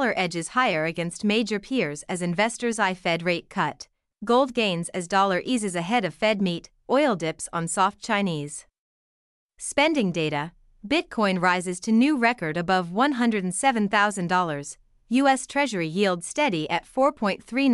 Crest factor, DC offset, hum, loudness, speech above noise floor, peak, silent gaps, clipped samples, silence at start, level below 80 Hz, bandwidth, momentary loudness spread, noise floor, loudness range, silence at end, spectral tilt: 18 dB; under 0.1%; none; -24 LUFS; over 66 dB; -6 dBFS; 8.78-9.49 s; under 0.1%; 0 s; -60 dBFS; 12 kHz; 7 LU; under -90 dBFS; 4 LU; 0 s; -4.5 dB/octave